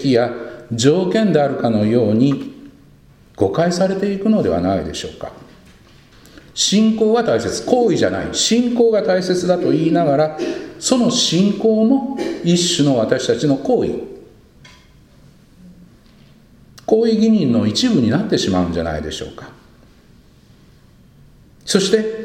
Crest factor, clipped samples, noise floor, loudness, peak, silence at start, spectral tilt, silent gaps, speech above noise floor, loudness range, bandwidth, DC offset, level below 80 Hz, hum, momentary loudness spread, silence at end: 18 dB; under 0.1%; -48 dBFS; -16 LUFS; 0 dBFS; 0 s; -5 dB/octave; none; 32 dB; 8 LU; 15.5 kHz; under 0.1%; -46 dBFS; none; 12 LU; 0 s